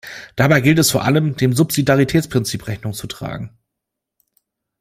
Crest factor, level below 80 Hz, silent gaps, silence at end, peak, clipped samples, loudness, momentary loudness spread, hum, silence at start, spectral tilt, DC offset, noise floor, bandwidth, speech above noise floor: 16 dB; -46 dBFS; none; 1.35 s; -2 dBFS; under 0.1%; -17 LUFS; 15 LU; none; 0.05 s; -5 dB/octave; under 0.1%; -81 dBFS; 16 kHz; 64 dB